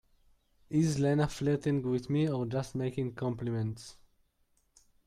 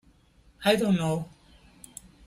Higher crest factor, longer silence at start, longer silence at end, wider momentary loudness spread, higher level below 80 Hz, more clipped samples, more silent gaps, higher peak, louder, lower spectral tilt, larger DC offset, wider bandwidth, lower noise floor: about the same, 16 dB vs 20 dB; about the same, 0.7 s vs 0.6 s; first, 1.15 s vs 1 s; second, 7 LU vs 22 LU; about the same, -58 dBFS vs -58 dBFS; neither; neither; second, -16 dBFS vs -8 dBFS; second, -32 LUFS vs -26 LUFS; first, -7 dB/octave vs -5.5 dB/octave; neither; second, 13.5 kHz vs 15.5 kHz; first, -73 dBFS vs -60 dBFS